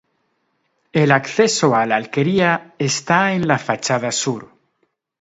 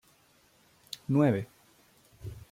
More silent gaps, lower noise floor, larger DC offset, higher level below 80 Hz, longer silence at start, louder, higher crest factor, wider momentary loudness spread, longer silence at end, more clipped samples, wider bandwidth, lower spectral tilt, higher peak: neither; about the same, -68 dBFS vs -65 dBFS; neither; about the same, -60 dBFS vs -62 dBFS; second, 0.95 s vs 1.1 s; first, -17 LUFS vs -29 LUFS; about the same, 18 dB vs 20 dB; second, 6 LU vs 21 LU; first, 0.75 s vs 0.1 s; neither; second, 8 kHz vs 16 kHz; second, -4.5 dB/octave vs -7.5 dB/octave; first, 0 dBFS vs -14 dBFS